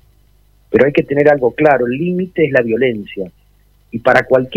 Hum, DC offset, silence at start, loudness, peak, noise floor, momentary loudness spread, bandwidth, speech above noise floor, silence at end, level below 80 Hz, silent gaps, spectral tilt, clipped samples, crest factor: 50 Hz at -45 dBFS; under 0.1%; 0.7 s; -14 LUFS; 0 dBFS; -51 dBFS; 14 LU; 8.8 kHz; 38 dB; 0 s; -48 dBFS; none; -8 dB/octave; 0.3%; 14 dB